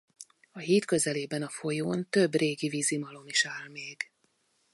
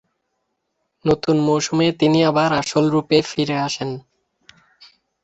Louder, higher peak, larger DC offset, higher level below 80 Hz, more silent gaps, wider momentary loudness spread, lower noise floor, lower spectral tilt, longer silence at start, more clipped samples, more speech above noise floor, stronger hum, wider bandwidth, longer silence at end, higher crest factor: second, -29 LUFS vs -18 LUFS; second, -12 dBFS vs -2 dBFS; neither; second, -76 dBFS vs -54 dBFS; neither; first, 13 LU vs 9 LU; about the same, -72 dBFS vs -73 dBFS; second, -3.5 dB/octave vs -5.5 dB/octave; second, 0.2 s vs 1.05 s; neither; second, 43 dB vs 56 dB; neither; first, 12 kHz vs 8.2 kHz; second, 0.7 s vs 1.25 s; about the same, 18 dB vs 18 dB